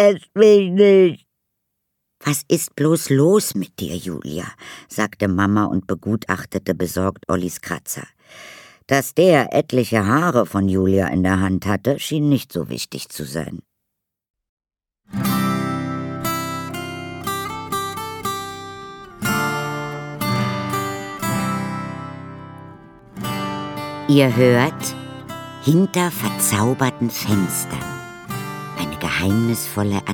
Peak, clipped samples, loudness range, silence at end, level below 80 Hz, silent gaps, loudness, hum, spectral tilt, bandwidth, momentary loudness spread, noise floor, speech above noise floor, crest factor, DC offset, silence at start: 0 dBFS; under 0.1%; 8 LU; 0 s; -52 dBFS; 14.30-14.34 s, 14.49-14.57 s; -20 LUFS; none; -5.5 dB/octave; 19 kHz; 16 LU; -79 dBFS; 61 dB; 20 dB; under 0.1%; 0 s